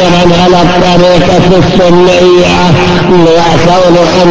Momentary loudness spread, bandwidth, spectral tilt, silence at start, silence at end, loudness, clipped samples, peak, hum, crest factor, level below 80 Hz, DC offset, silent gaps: 1 LU; 8 kHz; -6 dB/octave; 0 s; 0 s; -5 LUFS; 6%; 0 dBFS; none; 4 dB; -24 dBFS; 10%; none